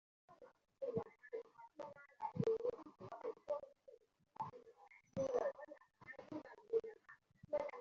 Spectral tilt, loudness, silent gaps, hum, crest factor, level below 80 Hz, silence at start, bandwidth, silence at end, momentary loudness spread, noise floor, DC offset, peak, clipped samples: -7 dB/octave; -46 LUFS; none; none; 20 dB; -80 dBFS; 0.3 s; 7.4 kHz; 0 s; 24 LU; -67 dBFS; under 0.1%; -26 dBFS; under 0.1%